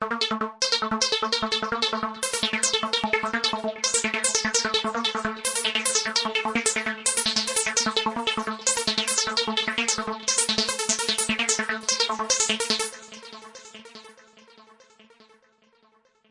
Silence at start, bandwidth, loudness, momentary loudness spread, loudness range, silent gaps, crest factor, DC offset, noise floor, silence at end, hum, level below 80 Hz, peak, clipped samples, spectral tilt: 0 s; 11.5 kHz; -23 LUFS; 5 LU; 3 LU; none; 22 dB; under 0.1%; -63 dBFS; 1.7 s; none; -60 dBFS; -4 dBFS; under 0.1%; -0.5 dB/octave